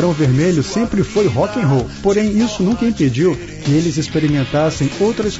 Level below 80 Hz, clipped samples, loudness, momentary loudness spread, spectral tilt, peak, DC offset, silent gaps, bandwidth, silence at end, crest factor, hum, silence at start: -36 dBFS; under 0.1%; -16 LUFS; 3 LU; -6.5 dB/octave; -4 dBFS; under 0.1%; none; 8 kHz; 0 s; 12 dB; none; 0 s